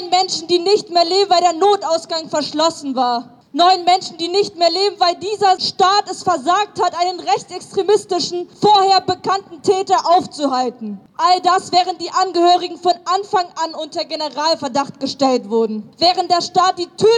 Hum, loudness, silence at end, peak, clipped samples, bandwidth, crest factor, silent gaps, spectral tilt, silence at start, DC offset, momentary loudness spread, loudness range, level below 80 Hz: none; -16 LUFS; 0 s; -2 dBFS; under 0.1%; 10.5 kHz; 14 dB; none; -3 dB/octave; 0 s; under 0.1%; 8 LU; 2 LU; -68 dBFS